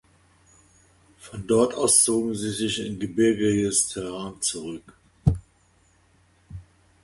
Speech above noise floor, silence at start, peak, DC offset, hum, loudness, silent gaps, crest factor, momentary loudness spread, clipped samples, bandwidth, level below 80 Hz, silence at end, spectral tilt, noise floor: 38 dB; 1.25 s; -4 dBFS; under 0.1%; none; -23 LUFS; none; 22 dB; 23 LU; under 0.1%; 12 kHz; -44 dBFS; 0.4 s; -4 dB/octave; -61 dBFS